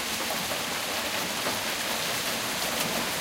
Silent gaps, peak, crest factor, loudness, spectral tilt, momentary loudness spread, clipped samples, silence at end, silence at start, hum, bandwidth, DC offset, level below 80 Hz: none; -14 dBFS; 16 dB; -28 LUFS; -1.5 dB/octave; 1 LU; under 0.1%; 0 s; 0 s; none; 16 kHz; under 0.1%; -58 dBFS